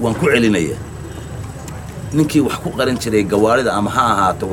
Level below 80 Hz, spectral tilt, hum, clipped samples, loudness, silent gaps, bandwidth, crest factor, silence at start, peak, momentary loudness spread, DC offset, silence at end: -38 dBFS; -5.5 dB/octave; none; under 0.1%; -16 LUFS; none; 17 kHz; 16 dB; 0 s; 0 dBFS; 16 LU; under 0.1%; 0 s